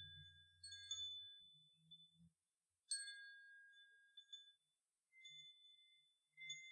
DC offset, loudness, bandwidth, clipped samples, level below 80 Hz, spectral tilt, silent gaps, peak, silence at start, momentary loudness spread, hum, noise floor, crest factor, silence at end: under 0.1%; -54 LUFS; 10.5 kHz; under 0.1%; under -90 dBFS; 2 dB/octave; none; -32 dBFS; 0 s; 19 LU; none; under -90 dBFS; 26 dB; 0 s